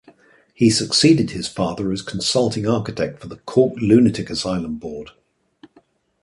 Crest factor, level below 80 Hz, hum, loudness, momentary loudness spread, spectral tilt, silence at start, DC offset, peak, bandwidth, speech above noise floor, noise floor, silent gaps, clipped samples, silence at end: 18 dB; -48 dBFS; none; -19 LUFS; 13 LU; -5 dB/octave; 0.6 s; under 0.1%; -2 dBFS; 11.5 kHz; 38 dB; -57 dBFS; none; under 0.1%; 1.15 s